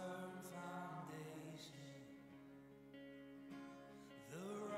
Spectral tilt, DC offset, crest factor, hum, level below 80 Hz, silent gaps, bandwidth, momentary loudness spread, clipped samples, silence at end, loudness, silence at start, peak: -5.5 dB/octave; under 0.1%; 16 dB; none; -84 dBFS; none; 15.5 kHz; 10 LU; under 0.1%; 0 s; -55 LUFS; 0 s; -38 dBFS